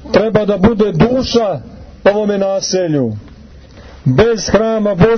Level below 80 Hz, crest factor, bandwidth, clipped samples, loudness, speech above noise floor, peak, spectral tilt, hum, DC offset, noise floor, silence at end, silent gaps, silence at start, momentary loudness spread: -34 dBFS; 12 dB; 6.6 kHz; under 0.1%; -13 LUFS; 25 dB; 0 dBFS; -6 dB/octave; none; under 0.1%; -37 dBFS; 0 s; none; 0 s; 7 LU